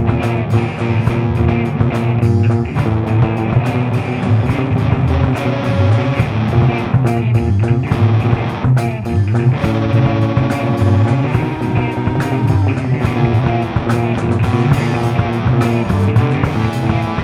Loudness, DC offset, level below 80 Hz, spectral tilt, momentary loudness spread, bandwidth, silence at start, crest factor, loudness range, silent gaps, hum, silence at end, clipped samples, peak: -15 LUFS; under 0.1%; -30 dBFS; -8.5 dB/octave; 3 LU; 11 kHz; 0 s; 14 dB; 1 LU; none; none; 0 s; under 0.1%; 0 dBFS